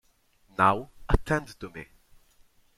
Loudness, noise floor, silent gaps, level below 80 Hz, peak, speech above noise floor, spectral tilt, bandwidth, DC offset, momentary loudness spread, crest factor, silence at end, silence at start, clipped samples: -27 LUFS; -64 dBFS; none; -36 dBFS; -6 dBFS; 37 dB; -6.5 dB/octave; 14 kHz; under 0.1%; 18 LU; 24 dB; 0.95 s; 0.6 s; under 0.1%